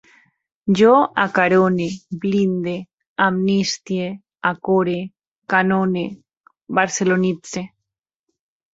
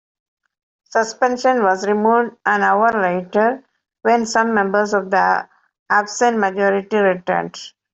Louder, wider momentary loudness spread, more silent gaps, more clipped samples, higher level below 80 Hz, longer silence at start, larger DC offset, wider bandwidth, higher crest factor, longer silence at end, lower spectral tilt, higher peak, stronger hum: about the same, -19 LUFS vs -17 LUFS; first, 14 LU vs 6 LU; first, 2.93-2.97 s, 3.07-3.16 s, 5.27-5.32 s, 5.38-5.42 s, 6.37-6.44 s vs 5.79-5.86 s; neither; about the same, -60 dBFS vs -64 dBFS; second, 0.65 s vs 0.95 s; neither; about the same, 7.8 kHz vs 8.2 kHz; about the same, 18 dB vs 16 dB; first, 1.05 s vs 0.25 s; about the same, -5.5 dB/octave vs -4.5 dB/octave; about the same, -2 dBFS vs -2 dBFS; neither